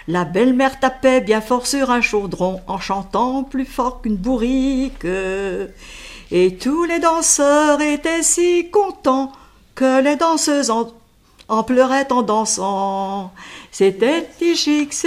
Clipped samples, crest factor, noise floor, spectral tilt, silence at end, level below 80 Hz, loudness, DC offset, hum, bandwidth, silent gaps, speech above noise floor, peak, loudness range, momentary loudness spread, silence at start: under 0.1%; 16 dB; -50 dBFS; -3.5 dB/octave; 0 s; -42 dBFS; -17 LUFS; under 0.1%; none; 15.5 kHz; none; 32 dB; 0 dBFS; 5 LU; 9 LU; 0.05 s